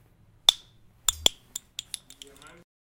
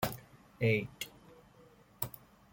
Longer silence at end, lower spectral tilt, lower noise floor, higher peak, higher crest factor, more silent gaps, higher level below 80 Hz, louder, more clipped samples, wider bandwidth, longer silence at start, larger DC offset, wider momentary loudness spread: first, 1.65 s vs 0.35 s; second, 0.5 dB/octave vs -5.5 dB/octave; second, -55 dBFS vs -61 dBFS; first, 0 dBFS vs -14 dBFS; first, 30 dB vs 24 dB; neither; first, -54 dBFS vs -64 dBFS; first, -25 LUFS vs -36 LUFS; neither; about the same, 17 kHz vs 17 kHz; first, 0.5 s vs 0 s; neither; first, 24 LU vs 16 LU